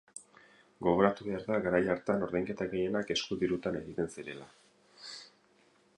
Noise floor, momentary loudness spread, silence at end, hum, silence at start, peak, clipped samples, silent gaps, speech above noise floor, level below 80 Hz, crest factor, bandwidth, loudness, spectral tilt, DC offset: -67 dBFS; 19 LU; 0.7 s; none; 0.15 s; -10 dBFS; under 0.1%; none; 35 dB; -62 dBFS; 24 dB; 11 kHz; -32 LUFS; -5.5 dB/octave; under 0.1%